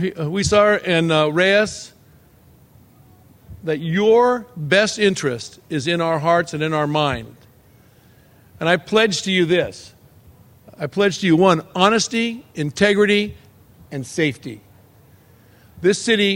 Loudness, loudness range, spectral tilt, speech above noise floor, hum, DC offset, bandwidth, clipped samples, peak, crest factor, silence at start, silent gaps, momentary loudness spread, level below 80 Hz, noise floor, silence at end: -18 LUFS; 4 LU; -4.5 dB/octave; 33 dB; none; under 0.1%; 16.5 kHz; under 0.1%; 0 dBFS; 20 dB; 0 s; none; 14 LU; -50 dBFS; -51 dBFS; 0 s